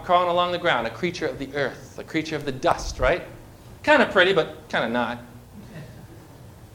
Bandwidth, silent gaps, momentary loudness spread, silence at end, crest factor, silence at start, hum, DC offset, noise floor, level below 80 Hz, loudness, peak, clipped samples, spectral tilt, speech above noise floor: 17.5 kHz; none; 23 LU; 0.1 s; 22 dB; 0 s; none; under 0.1%; -45 dBFS; -44 dBFS; -23 LUFS; -4 dBFS; under 0.1%; -4.5 dB/octave; 22 dB